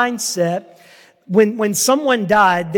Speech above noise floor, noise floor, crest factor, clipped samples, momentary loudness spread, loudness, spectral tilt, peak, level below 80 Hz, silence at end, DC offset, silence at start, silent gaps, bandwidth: 31 dB; -47 dBFS; 16 dB; under 0.1%; 7 LU; -16 LUFS; -3.5 dB/octave; -2 dBFS; -60 dBFS; 0 s; under 0.1%; 0 s; none; 17.5 kHz